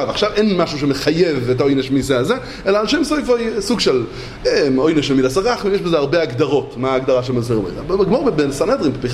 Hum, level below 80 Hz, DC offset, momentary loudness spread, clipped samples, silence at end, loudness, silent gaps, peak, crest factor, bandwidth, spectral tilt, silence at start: none; -40 dBFS; under 0.1%; 4 LU; under 0.1%; 0 s; -17 LUFS; none; -2 dBFS; 14 dB; 14.5 kHz; -5.5 dB/octave; 0 s